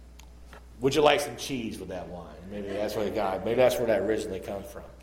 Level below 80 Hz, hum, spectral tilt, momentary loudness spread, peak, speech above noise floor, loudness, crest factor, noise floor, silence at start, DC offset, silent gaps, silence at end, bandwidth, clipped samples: -50 dBFS; none; -4.5 dB/octave; 15 LU; -6 dBFS; 20 dB; -28 LUFS; 22 dB; -48 dBFS; 0 s; under 0.1%; none; 0 s; 17 kHz; under 0.1%